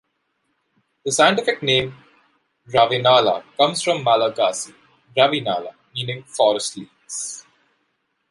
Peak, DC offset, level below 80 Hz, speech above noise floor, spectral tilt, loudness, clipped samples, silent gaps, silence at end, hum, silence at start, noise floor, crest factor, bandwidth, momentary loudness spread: -2 dBFS; under 0.1%; -62 dBFS; 52 dB; -3 dB/octave; -19 LUFS; under 0.1%; none; 0.9 s; none; 1.05 s; -71 dBFS; 20 dB; 11.5 kHz; 15 LU